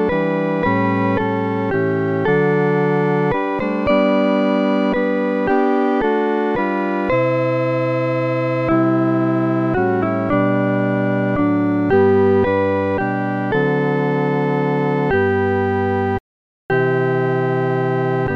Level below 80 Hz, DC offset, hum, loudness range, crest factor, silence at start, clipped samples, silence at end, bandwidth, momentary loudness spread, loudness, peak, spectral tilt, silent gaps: -46 dBFS; under 0.1%; none; 2 LU; 14 dB; 0 s; under 0.1%; 0 s; 6.4 kHz; 3 LU; -17 LUFS; -4 dBFS; -9 dB/octave; 16.20-16.69 s